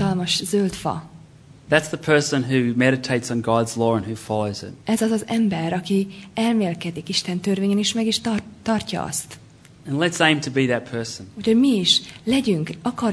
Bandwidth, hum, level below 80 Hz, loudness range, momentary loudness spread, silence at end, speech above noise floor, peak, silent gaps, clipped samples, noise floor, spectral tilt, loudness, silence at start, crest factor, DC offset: 11 kHz; none; -54 dBFS; 3 LU; 10 LU; 0 s; 25 dB; 0 dBFS; none; under 0.1%; -46 dBFS; -4.5 dB/octave; -21 LUFS; 0 s; 20 dB; under 0.1%